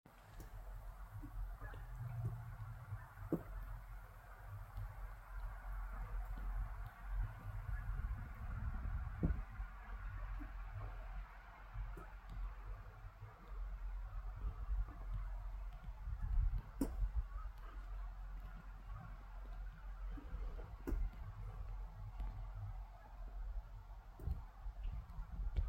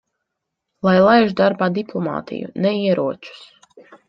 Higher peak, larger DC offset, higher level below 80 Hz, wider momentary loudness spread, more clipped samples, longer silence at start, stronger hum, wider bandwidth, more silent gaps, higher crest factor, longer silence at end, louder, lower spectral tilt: second, -24 dBFS vs -2 dBFS; neither; first, -46 dBFS vs -60 dBFS; second, 10 LU vs 15 LU; neither; second, 0.05 s vs 0.85 s; neither; first, 16 kHz vs 6.4 kHz; neither; about the same, 20 dB vs 18 dB; second, 0 s vs 0.15 s; second, -50 LUFS vs -18 LUFS; about the same, -8 dB/octave vs -8 dB/octave